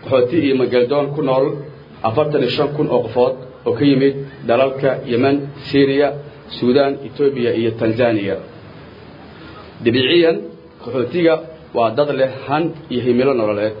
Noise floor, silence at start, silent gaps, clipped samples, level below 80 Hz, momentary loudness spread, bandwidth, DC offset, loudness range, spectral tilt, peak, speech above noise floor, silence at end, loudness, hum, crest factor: -38 dBFS; 0.05 s; none; under 0.1%; -54 dBFS; 11 LU; 5.4 kHz; under 0.1%; 2 LU; -9 dB/octave; -2 dBFS; 22 dB; 0 s; -17 LUFS; none; 16 dB